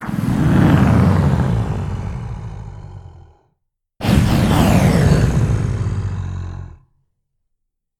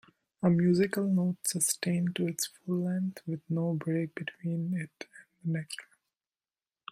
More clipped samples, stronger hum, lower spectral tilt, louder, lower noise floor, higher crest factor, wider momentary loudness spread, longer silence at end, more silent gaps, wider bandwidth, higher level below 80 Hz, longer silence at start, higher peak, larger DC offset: neither; neither; first, -7 dB/octave vs -5.5 dB/octave; first, -16 LUFS vs -31 LUFS; second, -73 dBFS vs under -90 dBFS; about the same, 16 dB vs 18 dB; first, 18 LU vs 14 LU; first, 1.35 s vs 1.1 s; neither; about the same, 17.5 kHz vs 16 kHz; first, -28 dBFS vs -72 dBFS; second, 0 s vs 0.4 s; first, 0 dBFS vs -14 dBFS; neither